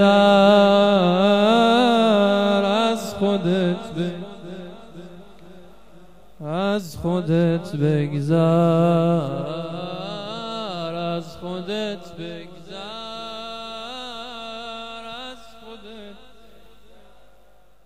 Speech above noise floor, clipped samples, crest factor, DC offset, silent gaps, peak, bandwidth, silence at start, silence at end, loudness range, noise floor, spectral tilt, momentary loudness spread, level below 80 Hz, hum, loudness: 39 dB; under 0.1%; 18 dB; 0.6%; none; -2 dBFS; 14.5 kHz; 0 s; 1.7 s; 16 LU; -56 dBFS; -6.5 dB/octave; 21 LU; -56 dBFS; none; -20 LUFS